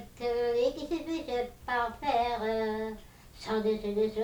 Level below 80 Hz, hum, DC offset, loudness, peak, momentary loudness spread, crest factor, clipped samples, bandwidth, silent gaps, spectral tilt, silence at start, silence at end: -54 dBFS; none; under 0.1%; -32 LUFS; -18 dBFS; 7 LU; 14 dB; under 0.1%; over 20 kHz; none; -5.5 dB/octave; 0 s; 0 s